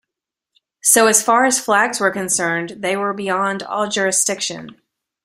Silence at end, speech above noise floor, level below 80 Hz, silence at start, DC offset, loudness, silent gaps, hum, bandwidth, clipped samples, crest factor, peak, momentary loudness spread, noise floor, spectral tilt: 0.5 s; 66 dB; -64 dBFS; 0.85 s; under 0.1%; -16 LUFS; none; none; 16 kHz; under 0.1%; 18 dB; 0 dBFS; 10 LU; -84 dBFS; -2 dB/octave